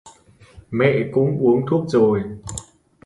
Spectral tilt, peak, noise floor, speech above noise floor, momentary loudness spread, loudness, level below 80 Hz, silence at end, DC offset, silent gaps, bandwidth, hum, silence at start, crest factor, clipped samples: -7 dB/octave; -2 dBFS; -49 dBFS; 31 dB; 15 LU; -19 LUFS; -50 dBFS; 0.45 s; under 0.1%; none; 11.5 kHz; none; 0.05 s; 18 dB; under 0.1%